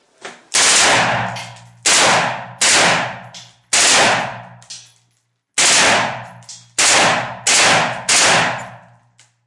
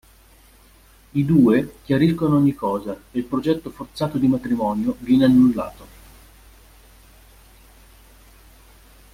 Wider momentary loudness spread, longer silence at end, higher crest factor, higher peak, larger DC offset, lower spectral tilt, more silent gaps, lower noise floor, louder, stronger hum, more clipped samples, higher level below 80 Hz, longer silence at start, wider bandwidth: first, 17 LU vs 13 LU; second, 0.7 s vs 3.3 s; about the same, 16 dB vs 18 dB; first, 0 dBFS vs -4 dBFS; neither; second, -0.5 dB/octave vs -8 dB/octave; neither; first, -65 dBFS vs -51 dBFS; first, -13 LUFS vs -20 LUFS; neither; neither; second, -54 dBFS vs -48 dBFS; second, 0.25 s vs 1.15 s; second, 11.5 kHz vs 15.5 kHz